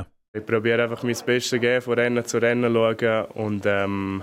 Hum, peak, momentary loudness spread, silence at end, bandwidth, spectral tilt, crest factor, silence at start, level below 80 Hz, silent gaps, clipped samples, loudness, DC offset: none; -6 dBFS; 5 LU; 0 s; 16 kHz; -5 dB/octave; 16 dB; 0 s; -64 dBFS; 0.28-0.34 s; under 0.1%; -22 LUFS; under 0.1%